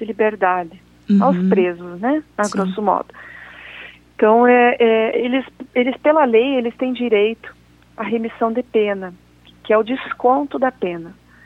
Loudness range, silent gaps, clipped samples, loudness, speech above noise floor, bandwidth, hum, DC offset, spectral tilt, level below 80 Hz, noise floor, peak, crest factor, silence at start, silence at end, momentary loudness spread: 5 LU; none; under 0.1%; -17 LUFS; 22 dB; 11 kHz; 60 Hz at -55 dBFS; under 0.1%; -6.5 dB/octave; -56 dBFS; -39 dBFS; -2 dBFS; 16 dB; 0 s; 0.35 s; 20 LU